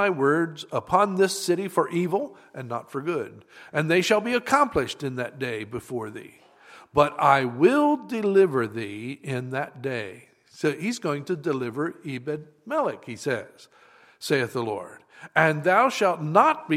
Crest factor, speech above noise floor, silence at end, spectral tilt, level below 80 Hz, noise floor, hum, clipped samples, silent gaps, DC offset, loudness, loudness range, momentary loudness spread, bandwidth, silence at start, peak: 22 dB; 26 dB; 0 s; -5.5 dB/octave; -62 dBFS; -51 dBFS; none; under 0.1%; none; under 0.1%; -25 LUFS; 7 LU; 14 LU; 16 kHz; 0 s; -2 dBFS